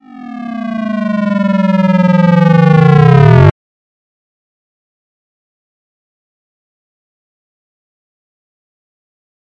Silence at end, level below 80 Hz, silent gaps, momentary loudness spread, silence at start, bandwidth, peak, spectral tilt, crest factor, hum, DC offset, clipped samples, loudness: 6 s; -42 dBFS; none; 15 LU; 0.15 s; 6.6 kHz; 0 dBFS; -9.5 dB/octave; 14 dB; none; under 0.1%; under 0.1%; -9 LUFS